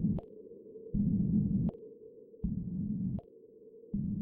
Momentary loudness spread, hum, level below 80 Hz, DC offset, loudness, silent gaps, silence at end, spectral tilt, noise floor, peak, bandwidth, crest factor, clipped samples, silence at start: 22 LU; none; -48 dBFS; under 0.1%; -35 LUFS; none; 0 s; -14 dB/octave; -56 dBFS; -20 dBFS; 1.3 kHz; 14 dB; under 0.1%; 0 s